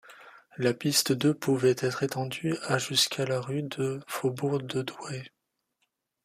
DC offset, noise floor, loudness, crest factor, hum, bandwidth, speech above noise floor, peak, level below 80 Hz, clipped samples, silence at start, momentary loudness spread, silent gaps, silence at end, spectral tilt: under 0.1%; -78 dBFS; -28 LUFS; 20 dB; none; 15.5 kHz; 50 dB; -10 dBFS; -70 dBFS; under 0.1%; 0.05 s; 9 LU; none; 0.95 s; -4 dB/octave